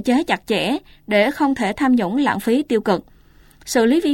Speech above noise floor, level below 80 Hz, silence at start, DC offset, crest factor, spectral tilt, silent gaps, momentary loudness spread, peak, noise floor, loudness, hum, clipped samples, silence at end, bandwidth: 31 dB; -50 dBFS; 0 s; under 0.1%; 16 dB; -4.5 dB/octave; none; 6 LU; -2 dBFS; -49 dBFS; -19 LUFS; none; under 0.1%; 0 s; 17 kHz